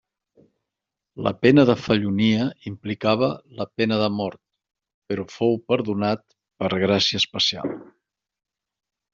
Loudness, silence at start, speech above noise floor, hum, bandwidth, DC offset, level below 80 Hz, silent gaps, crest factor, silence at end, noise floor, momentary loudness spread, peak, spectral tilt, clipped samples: -22 LUFS; 1.15 s; 64 dB; none; 7.6 kHz; under 0.1%; -60 dBFS; 4.94-5.02 s; 22 dB; 1.3 s; -85 dBFS; 14 LU; -2 dBFS; -5.5 dB/octave; under 0.1%